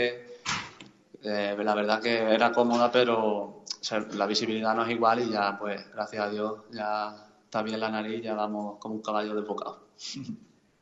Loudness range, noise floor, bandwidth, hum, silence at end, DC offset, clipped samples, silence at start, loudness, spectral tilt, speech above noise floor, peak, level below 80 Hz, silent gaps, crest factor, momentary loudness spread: 7 LU; -52 dBFS; 8 kHz; none; 0.35 s; under 0.1%; under 0.1%; 0 s; -29 LUFS; -4 dB/octave; 23 dB; -8 dBFS; -72 dBFS; none; 22 dB; 14 LU